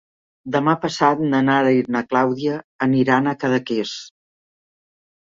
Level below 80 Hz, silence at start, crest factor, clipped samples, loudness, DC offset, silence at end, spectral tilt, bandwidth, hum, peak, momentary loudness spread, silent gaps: -62 dBFS; 0.45 s; 18 dB; under 0.1%; -19 LUFS; under 0.1%; 1.15 s; -6 dB/octave; 7.6 kHz; none; -2 dBFS; 8 LU; 2.64-2.79 s